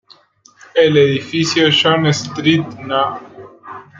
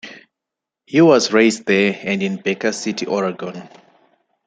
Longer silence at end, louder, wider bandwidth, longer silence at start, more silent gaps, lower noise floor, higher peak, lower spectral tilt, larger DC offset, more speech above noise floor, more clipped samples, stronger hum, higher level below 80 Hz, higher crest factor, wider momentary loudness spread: second, 0.2 s vs 0.8 s; first, -14 LUFS vs -17 LUFS; second, 7.6 kHz vs 9.4 kHz; first, 0.75 s vs 0.05 s; neither; second, -49 dBFS vs -84 dBFS; about the same, -2 dBFS vs -2 dBFS; about the same, -5 dB/octave vs -4.5 dB/octave; neither; second, 35 dB vs 67 dB; neither; neither; first, -58 dBFS vs -64 dBFS; about the same, 14 dB vs 16 dB; second, 11 LU vs 17 LU